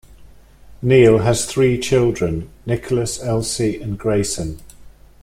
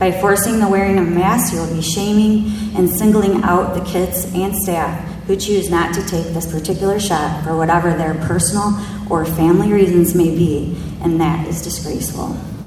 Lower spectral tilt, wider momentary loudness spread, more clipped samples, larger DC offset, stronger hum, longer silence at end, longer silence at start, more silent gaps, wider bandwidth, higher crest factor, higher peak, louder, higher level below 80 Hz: about the same, -5.5 dB/octave vs -5.5 dB/octave; first, 13 LU vs 8 LU; neither; neither; neither; first, 0.35 s vs 0 s; about the same, 0.1 s vs 0 s; neither; second, 15.5 kHz vs 19.5 kHz; about the same, 16 dB vs 16 dB; about the same, -2 dBFS vs 0 dBFS; about the same, -18 LUFS vs -16 LUFS; about the same, -40 dBFS vs -36 dBFS